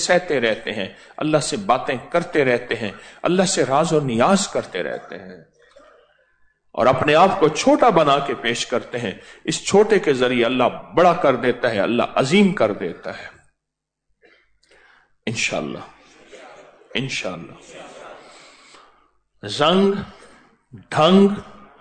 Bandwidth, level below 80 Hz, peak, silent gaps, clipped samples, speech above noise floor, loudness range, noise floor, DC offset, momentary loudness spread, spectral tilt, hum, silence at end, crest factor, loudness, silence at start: 9.4 kHz; -54 dBFS; -4 dBFS; none; under 0.1%; 62 dB; 12 LU; -81 dBFS; under 0.1%; 18 LU; -4.5 dB/octave; none; 0.3 s; 16 dB; -19 LUFS; 0 s